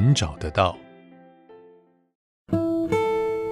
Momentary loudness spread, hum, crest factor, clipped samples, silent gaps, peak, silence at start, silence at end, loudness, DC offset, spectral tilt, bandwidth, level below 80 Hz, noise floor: 4 LU; none; 20 dB; under 0.1%; 2.15-2.46 s; -6 dBFS; 0 s; 0 s; -24 LUFS; under 0.1%; -6 dB/octave; 12 kHz; -46 dBFS; -55 dBFS